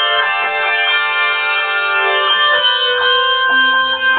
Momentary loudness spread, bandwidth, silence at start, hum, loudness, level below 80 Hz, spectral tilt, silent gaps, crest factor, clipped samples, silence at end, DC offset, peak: 3 LU; 4.7 kHz; 0 s; none; -12 LUFS; -62 dBFS; -3.5 dB/octave; none; 12 dB; under 0.1%; 0 s; under 0.1%; 0 dBFS